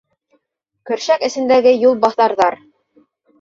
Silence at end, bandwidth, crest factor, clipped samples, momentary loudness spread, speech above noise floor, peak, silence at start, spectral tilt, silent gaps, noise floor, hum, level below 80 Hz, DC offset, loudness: 0.85 s; 7.6 kHz; 14 dB; under 0.1%; 11 LU; 58 dB; -2 dBFS; 0.85 s; -3.5 dB/octave; none; -72 dBFS; none; -62 dBFS; under 0.1%; -15 LUFS